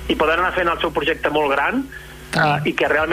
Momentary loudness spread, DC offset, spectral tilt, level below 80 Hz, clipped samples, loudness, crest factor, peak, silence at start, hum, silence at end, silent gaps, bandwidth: 7 LU; under 0.1%; -5 dB/octave; -40 dBFS; under 0.1%; -19 LUFS; 14 dB; -6 dBFS; 0 s; none; 0 s; none; 15.5 kHz